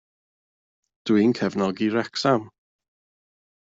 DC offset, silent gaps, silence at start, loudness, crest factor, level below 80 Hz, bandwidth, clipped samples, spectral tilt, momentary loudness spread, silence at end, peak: under 0.1%; none; 1.05 s; -23 LUFS; 18 dB; -68 dBFS; 7.8 kHz; under 0.1%; -6 dB/octave; 5 LU; 1.1 s; -8 dBFS